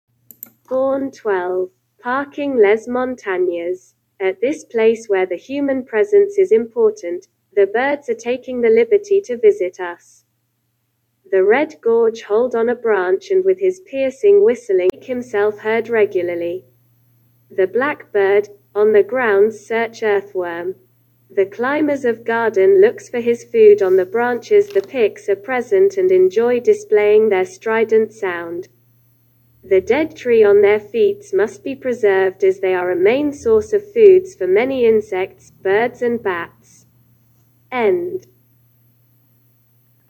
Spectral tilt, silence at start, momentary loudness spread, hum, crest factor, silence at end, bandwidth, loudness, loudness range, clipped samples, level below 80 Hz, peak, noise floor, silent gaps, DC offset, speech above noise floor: -5.5 dB/octave; 0.7 s; 11 LU; none; 16 dB; 1.9 s; 17.5 kHz; -16 LUFS; 5 LU; under 0.1%; -60 dBFS; 0 dBFS; -68 dBFS; none; under 0.1%; 52 dB